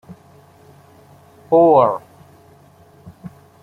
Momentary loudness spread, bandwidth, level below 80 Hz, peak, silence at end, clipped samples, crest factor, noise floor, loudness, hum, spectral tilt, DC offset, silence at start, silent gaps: 28 LU; 10.5 kHz; -62 dBFS; -2 dBFS; 0.35 s; under 0.1%; 18 dB; -48 dBFS; -14 LUFS; none; -9 dB/octave; under 0.1%; 0.1 s; none